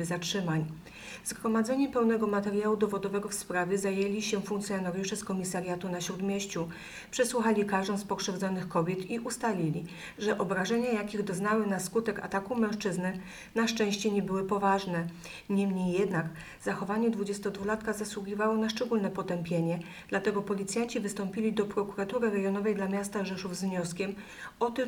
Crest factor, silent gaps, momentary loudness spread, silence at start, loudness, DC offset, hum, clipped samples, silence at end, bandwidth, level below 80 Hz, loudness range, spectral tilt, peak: 16 dB; none; 7 LU; 0 s; -31 LUFS; under 0.1%; none; under 0.1%; 0 s; 19.5 kHz; -62 dBFS; 2 LU; -5 dB/octave; -14 dBFS